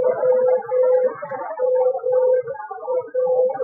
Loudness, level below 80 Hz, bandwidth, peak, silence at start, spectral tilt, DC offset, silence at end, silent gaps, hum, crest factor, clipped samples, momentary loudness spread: -20 LUFS; -80 dBFS; 2.3 kHz; -8 dBFS; 0 s; -10.5 dB/octave; under 0.1%; 0 s; none; none; 12 dB; under 0.1%; 11 LU